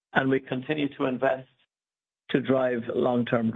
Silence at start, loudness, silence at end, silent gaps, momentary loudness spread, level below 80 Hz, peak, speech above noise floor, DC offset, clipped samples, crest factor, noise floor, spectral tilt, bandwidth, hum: 0.15 s; -27 LUFS; 0 s; none; 5 LU; -66 dBFS; -6 dBFS; over 64 dB; under 0.1%; under 0.1%; 22 dB; under -90 dBFS; -9 dB/octave; 4.1 kHz; none